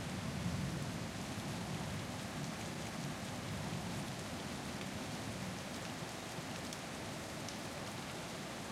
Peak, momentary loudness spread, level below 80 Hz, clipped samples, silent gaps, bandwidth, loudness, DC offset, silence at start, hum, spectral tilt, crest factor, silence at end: -26 dBFS; 3 LU; -62 dBFS; under 0.1%; none; 16.5 kHz; -43 LUFS; under 0.1%; 0 s; none; -4.5 dB/octave; 18 dB; 0 s